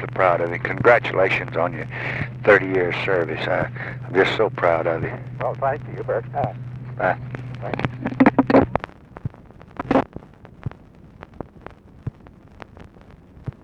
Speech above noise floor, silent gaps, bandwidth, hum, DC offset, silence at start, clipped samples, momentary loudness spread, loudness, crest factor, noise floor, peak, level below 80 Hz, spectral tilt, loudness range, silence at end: 25 dB; none; 8.4 kHz; none; under 0.1%; 0 s; under 0.1%; 20 LU; -21 LUFS; 22 dB; -46 dBFS; 0 dBFS; -48 dBFS; -7.5 dB/octave; 10 LU; 0.15 s